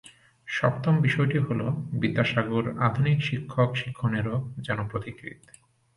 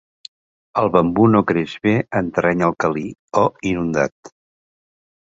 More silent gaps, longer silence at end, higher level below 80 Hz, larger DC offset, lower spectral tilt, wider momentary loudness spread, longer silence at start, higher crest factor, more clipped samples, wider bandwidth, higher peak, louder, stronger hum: second, none vs 3.19-3.28 s, 4.12-4.23 s; second, 0.6 s vs 0.95 s; second, -56 dBFS vs -48 dBFS; neither; about the same, -7.5 dB/octave vs -7 dB/octave; about the same, 10 LU vs 8 LU; second, 0.05 s vs 0.75 s; about the same, 18 dB vs 18 dB; neither; first, 11.5 kHz vs 7.8 kHz; second, -8 dBFS vs -2 dBFS; second, -26 LUFS vs -18 LUFS; neither